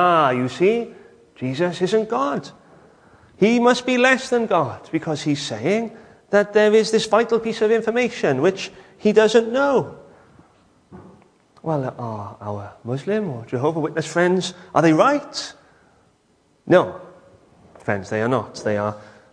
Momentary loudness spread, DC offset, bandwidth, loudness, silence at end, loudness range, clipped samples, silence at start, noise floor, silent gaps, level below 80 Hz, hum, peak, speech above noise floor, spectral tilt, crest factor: 15 LU; under 0.1%; 10.5 kHz; -20 LUFS; 0.3 s; 7 LU; under 0.1%; 0 s; -61 dBFS; none; -62 dBFS; none; -2 dBFS; 41 dB; -5.5 dB/octave; 18 dB